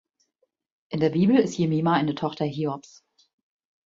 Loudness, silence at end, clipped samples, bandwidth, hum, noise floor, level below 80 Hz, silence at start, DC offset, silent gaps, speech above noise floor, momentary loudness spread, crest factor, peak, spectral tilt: -24 LUFS; 1.05 s; under 0.1%; 7.8 kHz; none; -74 dBFS; -66 dBFS; 0.9 s; under 0.1%; none; 51 dB; 10 LU; 18 dB; -8 dBFS; -7 dB/octave